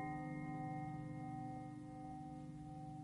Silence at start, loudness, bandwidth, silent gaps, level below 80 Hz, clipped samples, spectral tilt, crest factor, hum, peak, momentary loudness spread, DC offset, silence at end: 0 s; -49 LUFS; 11.5 kHz; none; -68 dBFS; under 0.1%; -8.5 dB/octave; 12 dB; none; -36 dBFS; 6 LU; under 0.1%; 0 s